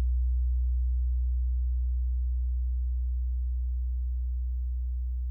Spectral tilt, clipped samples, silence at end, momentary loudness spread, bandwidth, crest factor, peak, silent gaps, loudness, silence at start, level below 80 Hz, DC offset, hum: -11.5 dB/octave; under 0.1%; 0 s; 4 LU; 0.2 kHz; 6 dB; -22 dBFS; none; -31 LUFS; 0 s; -28 dBFS; under 0.1%; none